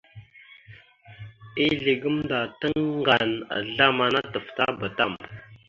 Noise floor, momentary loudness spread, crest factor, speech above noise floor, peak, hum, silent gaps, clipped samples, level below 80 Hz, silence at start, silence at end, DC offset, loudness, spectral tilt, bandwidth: -51 dBFS; 17 LU; 22 dB; 26 dB; -4 dBFS; none; none; under 0.1%; -58 dBFS; 0.15 s; 0.1 s; under 0.1%; -24 LUFS; -6.5 dB/octave; 7.4 kHz